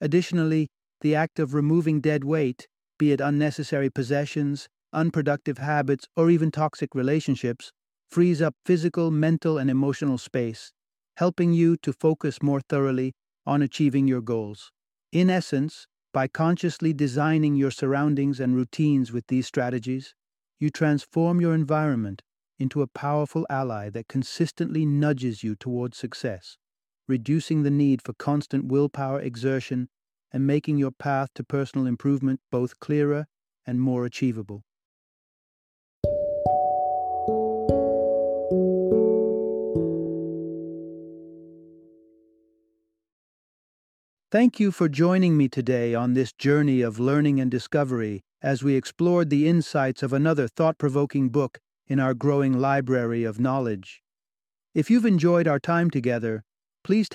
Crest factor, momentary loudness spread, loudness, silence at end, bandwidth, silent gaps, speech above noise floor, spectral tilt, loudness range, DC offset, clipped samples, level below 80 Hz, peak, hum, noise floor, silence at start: 18 dB; 10 LU; -24 LUFS; 0 s; 11.5 kHz; 34.85-36.02 s, 43.12-44.17 s; over 67 dB; -7.5 dB/octave; 5 LU; under 0.1%; under 0.1%; -58 dBFS; -6 dBFS; none; under -90 dBFS; 0 s